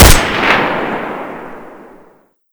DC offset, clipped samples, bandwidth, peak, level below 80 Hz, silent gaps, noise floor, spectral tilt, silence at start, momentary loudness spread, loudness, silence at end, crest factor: under 0.1%; 3%; over 20 kHz; 0 dBFS; -18 dBFS; none; -48 dBFS; -3.5 dB/octave; 0 s; 21 LU; -13 LUFS; 0.8 s; 12 dB